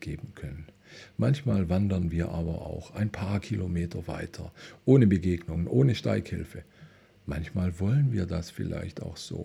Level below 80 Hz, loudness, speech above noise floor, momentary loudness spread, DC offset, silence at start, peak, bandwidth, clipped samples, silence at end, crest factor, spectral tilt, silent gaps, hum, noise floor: -46 dBFS; -29 LUFS; 26 dB; 18 LU; under 0.1%; 0 s; -8 dBFS; 12 kHz; under 0.1%; 0 s; 20 dB; -8 dB/octave; none; none; -54 dBFS